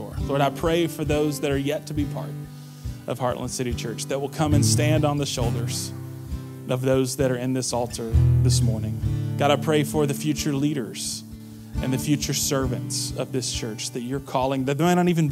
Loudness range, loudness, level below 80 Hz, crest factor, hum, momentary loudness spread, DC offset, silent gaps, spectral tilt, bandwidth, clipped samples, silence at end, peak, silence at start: 4 LU; -24 LUFS; -38 dBFS; 18 dB; none; 13 LU; under 0.1%; none; -5.5 dB/octave; 16 kHz; under 0.1%; 0 s; -6 dBFS; 0 s